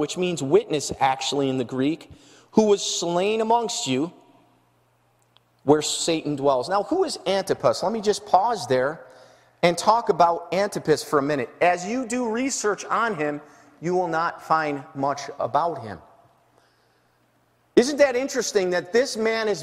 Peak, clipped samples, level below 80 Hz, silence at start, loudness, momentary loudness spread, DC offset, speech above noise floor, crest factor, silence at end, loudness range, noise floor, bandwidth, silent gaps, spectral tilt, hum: -2 dBFS; under 0.1%; -62 dBFS; 0 s; -23 LUFS; 7 LU; under 0.1%; 41 dB; 22 dB; 0 s; 4 LU; -64 dBFS; 15 kHz; none; -4 dB/octave; none